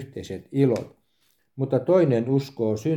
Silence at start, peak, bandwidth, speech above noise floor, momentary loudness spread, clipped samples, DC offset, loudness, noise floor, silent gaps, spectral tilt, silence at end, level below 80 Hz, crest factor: 0 s; -6 dBFS; 13.5 kHz; 46 dB; 15 LU; under 0.1%; under 0.1%; -23 LUFS; -69 dBFS; none; -8.5 dB/octave; 0 s; -64 dBFS; 16 dB